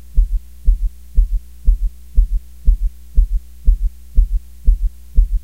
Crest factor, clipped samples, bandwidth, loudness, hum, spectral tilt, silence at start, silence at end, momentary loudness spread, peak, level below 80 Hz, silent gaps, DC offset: 14 dB; under 0.1%; 0.5 kHz; -22 LUFS; none; -8 dB/octave; 0.15 s; 0.05 s; 3 LU; 0 dBFS; -16 dBFS; none; 0.4%